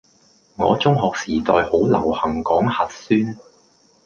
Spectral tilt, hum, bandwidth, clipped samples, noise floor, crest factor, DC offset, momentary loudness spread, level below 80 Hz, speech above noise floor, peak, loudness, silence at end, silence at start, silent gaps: -6.5 dB/octave; none; 7.4 kHz; under 0.1%; -56 dBFS; 18 dB; under 0.1%; 6 LU; -46 dBFS; 38 dB; -2 dBFS; -19 LUFS; 0.7 s; 0.6 s; none